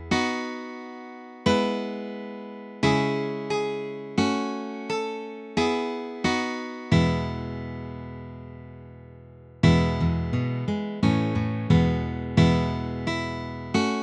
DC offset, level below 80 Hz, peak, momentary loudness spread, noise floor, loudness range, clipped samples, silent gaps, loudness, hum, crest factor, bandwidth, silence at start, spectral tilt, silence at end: under 0.1%; -44 dBFS; -6 dBFS; 17 LU; -47 dBFS; 4 LU; under 0.1%; none; -26 LUFS; none; 20 dB; 9.8 kHz; 0 s; -6.5 dB/octave; 0 s